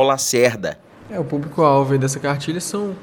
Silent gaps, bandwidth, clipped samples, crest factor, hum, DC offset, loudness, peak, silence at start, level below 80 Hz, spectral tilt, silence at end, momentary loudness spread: none; 18 kHz; under 0.1%; 18 dB; none; under 0.1%; -19 LUFS; 0 dBFS; 0 s; -56 dBFS; -4.5 dB/octave; 0 s; 13 LU